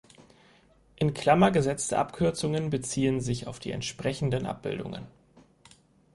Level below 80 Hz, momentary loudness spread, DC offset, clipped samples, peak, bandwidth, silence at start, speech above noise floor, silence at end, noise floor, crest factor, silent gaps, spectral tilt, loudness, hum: -54 dBFS; 12 LU; under 0.1%; under 0.1%; -8 dBFS; 11.5 kHz; 0.2 s; 33 dB; 1.05 s; -60 dBFS; 20 dB; none; -5.5 dB/octave; -28 LUFS; none